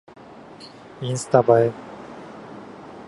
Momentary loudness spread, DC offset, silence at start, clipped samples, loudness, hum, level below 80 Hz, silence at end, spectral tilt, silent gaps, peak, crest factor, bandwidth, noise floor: 25 LU; under 0.1%; 0.6 s; under 0.1%; -20 LUFS; none; -62 dBFS; 0.05 s; -6 dB/octave; none; -2 dBFS; 22 dB; 11.5 kHz; -43 dBFS